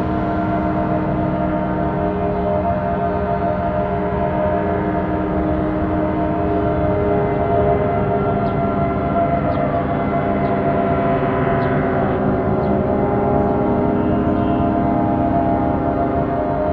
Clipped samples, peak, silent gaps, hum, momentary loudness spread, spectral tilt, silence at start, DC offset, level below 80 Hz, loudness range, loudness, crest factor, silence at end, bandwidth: under 0.1%; -4 dBFS; none; none; 3 LU; -11 dB/octave; 0 s; under 0.1%; -32 dBFS; 2 LU; -18 LUFS; 14 dB; 0 s; 5 kHz